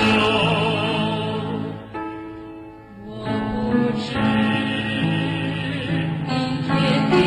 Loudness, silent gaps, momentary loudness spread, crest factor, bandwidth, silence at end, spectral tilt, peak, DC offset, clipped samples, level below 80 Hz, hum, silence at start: -22 LUFS; none; 16 LU; 14 dB; 10 kHz; 0 s; -6.5 dB/octave; -6 dBFS; under 0.1%; under 0.1%; -46 dBFS; none; 0 s